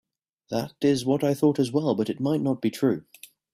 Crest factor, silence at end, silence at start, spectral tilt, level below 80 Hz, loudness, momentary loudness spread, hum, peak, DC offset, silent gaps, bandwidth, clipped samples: 16 dB; 0.55 s; 0.5 s; -6.5 dB/octave; -64 dBFS; -25 LUFS; 9 LU; none; -10 dBFS; under 0.1%; none; 15 kHz; under 0.1%